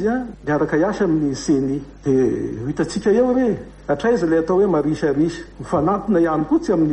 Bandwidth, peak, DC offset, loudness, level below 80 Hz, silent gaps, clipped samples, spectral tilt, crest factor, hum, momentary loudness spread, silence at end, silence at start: 9.6 kHz; -6 dBFS; under 0.1%; -19 LUFS; -44 dBFS; none; under 0.1%; -7 dB/octave; 14 dB; none; 8 LU; 0 s; 0 s